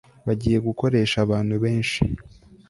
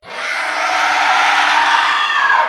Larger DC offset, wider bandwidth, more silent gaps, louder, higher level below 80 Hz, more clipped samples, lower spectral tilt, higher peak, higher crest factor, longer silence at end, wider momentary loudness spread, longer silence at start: neither; second, 11.5 kHz vs 14.5 kHz; neither; second, -23 LUFS vs -13 LUFS; first, -42 dBFS vs -62 dBFS; neither; first, -6.5 dB/octave vs 1 dB/octave; second, -6 dBFS vs 0 dBFS; about the same, 18 dB vs 14 dB; first, 0.4 s vs 0 s; about the same, 6 LU vs 6 LU; first, 0.25 s vs 0.05 s